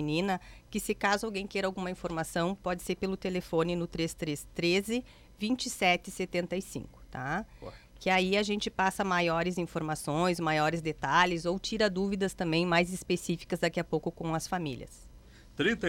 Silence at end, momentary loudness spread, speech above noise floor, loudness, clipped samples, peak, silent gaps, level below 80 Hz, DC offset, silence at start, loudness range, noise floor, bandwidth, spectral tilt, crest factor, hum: 0 s; 9 LU; 22 dB; -31 LUFS; under 0.1%; -12 dBFS; none; -54 dBFS; under 0.1%; 0 s; 4 LU; -54 dBFS; 17 kHz; -4.5 dB/octave; 20 dB; none